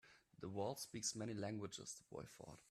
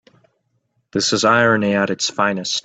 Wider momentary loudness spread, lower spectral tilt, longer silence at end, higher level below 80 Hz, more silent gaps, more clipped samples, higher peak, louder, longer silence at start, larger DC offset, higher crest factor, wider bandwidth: first, 12 LU vs 6 LU; about the same, -4 dB/octave vs -3.5 dB/octave; about the same, 0 s vs 0.05 s; second, -80 dBFS vs -60 dBFS; neither; neither; second, -30 dBFS vs -2 dBFS; second, -48 LUFS vs -17 LUFS; second, 0.05 s vs 0.95 s; neither; about the same, 18 dB vs 18 dB; first, 15.5 kHz vs 9.2 kHz